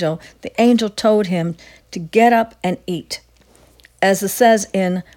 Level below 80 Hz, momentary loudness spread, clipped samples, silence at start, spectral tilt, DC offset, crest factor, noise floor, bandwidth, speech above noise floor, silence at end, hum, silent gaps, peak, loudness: -54 dBFS; 16 LU; under 0.1%; 0 s; -5 dB/octave; under 0.1%; 16 dB; -51 dBFS; 18 kHz; 34 dB; 0.15 s; none; none; 0 dBFS; -17 LUFS